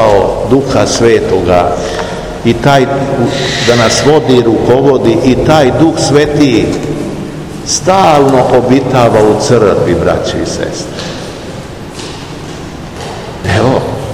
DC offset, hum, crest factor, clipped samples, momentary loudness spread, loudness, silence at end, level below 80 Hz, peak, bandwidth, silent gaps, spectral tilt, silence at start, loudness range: 0.8%; none; 10 dB; 3%; 16 LU; -9 LUFS; 0 s; -30 dBFS; 0 dBFS; 16 kHz; none; -5 dB/octave; 0 s; 9 LU